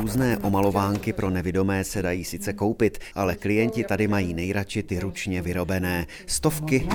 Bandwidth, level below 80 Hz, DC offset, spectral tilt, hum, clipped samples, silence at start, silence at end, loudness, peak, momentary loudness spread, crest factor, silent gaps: over 20 kHz; -44 dBFS; under 0.1%; -5.5 dB/octave; none; under 0.1%; 0 s; 0 s; -25 LUFS; -6 dBFS; 6 LU; 18 dB; none